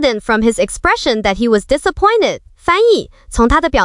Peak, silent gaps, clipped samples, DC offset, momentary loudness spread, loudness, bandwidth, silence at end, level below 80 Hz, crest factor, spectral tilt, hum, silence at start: -2 dBFS; none; under 0.1%; under 0.1%; 5 LU; -14 LUFS; 11.5 kHz; 0 s; -28 dBFS; 12 dB; -4 dB/octave; none; 0 s